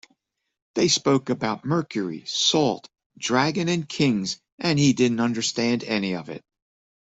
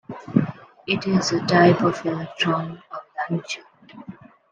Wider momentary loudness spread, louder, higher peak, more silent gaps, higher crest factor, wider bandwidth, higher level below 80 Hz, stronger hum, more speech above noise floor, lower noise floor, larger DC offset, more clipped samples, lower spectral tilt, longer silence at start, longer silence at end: second, 11 LU vs 22 LU; about the same, -23 LUFS vs -22 LUFS; second, -6 dBFS vs -2 dBFS; first, 3.06-3.10 s, 4.52-4.58 s vs none; about the same, 18 dB vs 20 dB; second, 8.2 kHz vs 9.2 kHz; about the same, -62 dBFS vs -62 dBFS; neither; first, 53 dB vs 22 dB; first, -76 dBFS vs -43 dBFS; neither; neither; second, -4 dB/octave vs -5.5 dB/octave; first, 0.75 s vs 0.1 s; first, 0.65 s vs 0.4 s